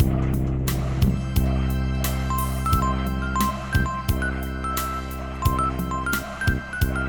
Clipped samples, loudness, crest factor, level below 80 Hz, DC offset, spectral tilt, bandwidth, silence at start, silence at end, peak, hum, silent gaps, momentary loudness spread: under 0.1%; -25 LUFS; 16 dB; -28 dBFS; under 0.1%; -5.5 dB/octave; over 20 kHz; 0 s; 0 s; -6 dBFS; none; none; 4 LU